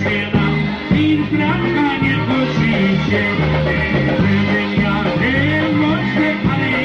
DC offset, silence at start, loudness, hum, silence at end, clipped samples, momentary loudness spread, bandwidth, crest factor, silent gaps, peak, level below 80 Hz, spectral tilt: under 0.1%; 0 s; -16 LUFS; none; 0 s; under 0.1%; 2 LU; 7 kHz; 12 dB; none; -2 dBFS; -34 dBFS; -7.5 dB/octave